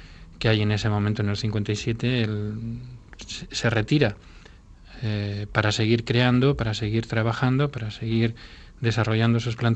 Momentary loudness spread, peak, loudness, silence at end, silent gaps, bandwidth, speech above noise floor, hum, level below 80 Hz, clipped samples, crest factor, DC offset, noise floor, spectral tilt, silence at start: 12 LU; -2 dBFS; -24 LUFS; 0 s; none; 8.4 kHz; 24 dB; none; -46 dBFS; under 0.1%; 22 dB; under 0.1%; -47 dBFS; -6 dB/octave; 0 s